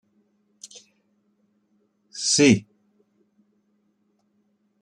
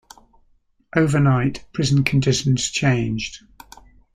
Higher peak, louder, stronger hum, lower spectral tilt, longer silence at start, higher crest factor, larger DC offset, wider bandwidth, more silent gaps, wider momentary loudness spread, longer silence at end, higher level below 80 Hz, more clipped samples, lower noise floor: about the same, -4 dBFS vs -2 dBFS; about the same, -19 LUFS vs -20 LUFS; neither; second, -3.5 dB/octave vs -5.5 dB/octave; first, 2.15 s vs 0.95 s; about the same, 24 dB vs 20 dB; neither; about the same, 11 kHz vs 11.5 kHz; neither; first, 27 LU vs 9 LU; first, 2.2 s vs 0.75 s; second, -66 dBFS vs -46 dBFS; neither; first, -69 dBFS vs -60 dBFS